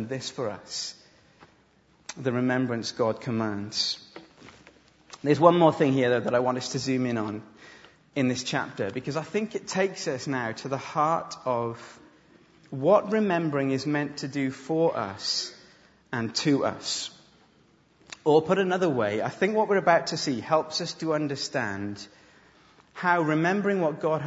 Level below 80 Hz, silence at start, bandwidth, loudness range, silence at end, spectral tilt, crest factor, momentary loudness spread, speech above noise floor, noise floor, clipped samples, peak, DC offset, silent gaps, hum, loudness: -70 dBFS; 0 s; 8 kHz; 5 LU; 0 s; -5 dB/octave; 26 dB; 12 LU; 36 dB; -62 dBFS; under 0.1%; -2 dBFS; under 0.1%; none; none; -26 LUFS